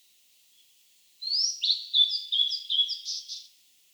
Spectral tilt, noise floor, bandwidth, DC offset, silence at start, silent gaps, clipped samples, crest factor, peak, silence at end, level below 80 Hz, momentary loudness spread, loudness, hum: 8 dB/octave; -62 dBFS; over 20 kHz; under 0.1%; 1.2 s; none; under 0.1%; 18 dB; -12 dBFS; 0.5 s; under -90 dBFS; 14 LU; -25 LUFS; none